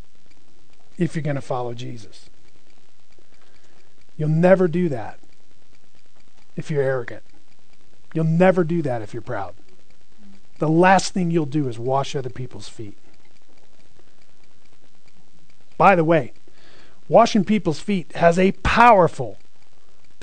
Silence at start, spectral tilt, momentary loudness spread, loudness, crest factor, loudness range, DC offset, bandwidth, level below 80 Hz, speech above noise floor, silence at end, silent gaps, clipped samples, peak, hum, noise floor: 1 s; -6.5 dB/octave; 21 LU; -19 LUFS; 22 dB; 13 LU; 4%; 9.4 kHz; -48 dBFS; 40 dB; 0.9 s; none; under 0.1%; 0 dBFS; none; -59 dBFS